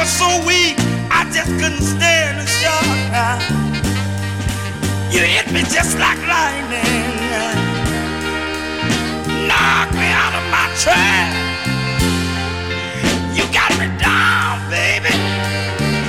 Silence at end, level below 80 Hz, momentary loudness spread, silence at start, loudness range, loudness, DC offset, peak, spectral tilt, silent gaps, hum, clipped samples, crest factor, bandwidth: 0 s; -34 dBFS; 8 LU; 0 s; 2 LU; -15 LUFS; under 0.1%; -2 dBFS; -3.5 dB/octave; none; none; under 0.1%; 14 dB; 16.5 kHz